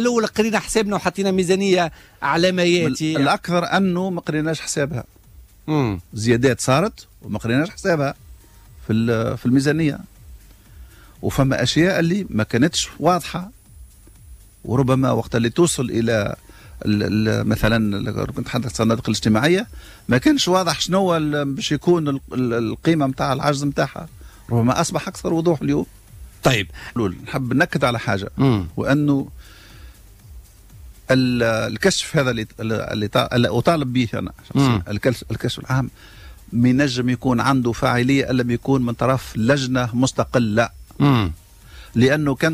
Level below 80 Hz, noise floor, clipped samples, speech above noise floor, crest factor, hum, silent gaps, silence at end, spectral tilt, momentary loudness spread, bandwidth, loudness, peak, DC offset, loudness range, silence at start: -42 dBFS; -46 dBFS; under 0.1%; 27 dB; 16 dB; none; none; 0 s; -5.5 dB/octave; 8 LU; 15.5 kHz; -20 LUFS; -4 dBFS; under 0.1%; 3 LU; 0 s